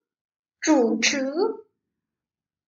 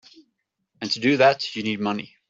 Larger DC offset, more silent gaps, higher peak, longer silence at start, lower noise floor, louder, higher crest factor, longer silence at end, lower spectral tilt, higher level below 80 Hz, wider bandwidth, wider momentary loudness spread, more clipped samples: neither; neither; second, -8 dBFS vs -4 dBFS; second, 0.6 s vs 0.8 s; first, under -90 dBFS vs -76 dBFS; about the same, -22 LUFS vs -22 LUFS; about the same, 18 dB vs 22 dB; first, 1.05 s vs 0.25 s; second, -2 dB/octave vs -5 dB/octave; second, -76 dBFS vs -66 dBFS; about the same, 8 kHz vs 7.8 kHz; about the same, 9 LU vs 10 LU; neither